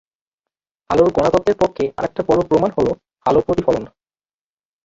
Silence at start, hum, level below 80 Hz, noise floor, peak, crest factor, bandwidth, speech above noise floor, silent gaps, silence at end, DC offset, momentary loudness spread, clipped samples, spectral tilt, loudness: 0.9 s; none; -44 dBFS; under -90 dBFS; -2 dBFS; 18 dB; 7.8 kHz; over 74 dB; none; 1 s; under 0.1%; 8 LU; under 0.1%; -7 dB/octave; -18 LUFS